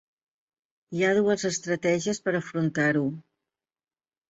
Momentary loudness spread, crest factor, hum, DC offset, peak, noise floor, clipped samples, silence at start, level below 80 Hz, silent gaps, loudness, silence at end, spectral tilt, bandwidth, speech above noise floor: 7 LU; 16 dB; none; under 0.1%; -12 dBFS; under -90 dBFS; under 0.1%; 0.9 s; -68 dBFS; none; -26 LUFS; 1.1 s; -5 dB/octave; 8 kHz; over 65 dB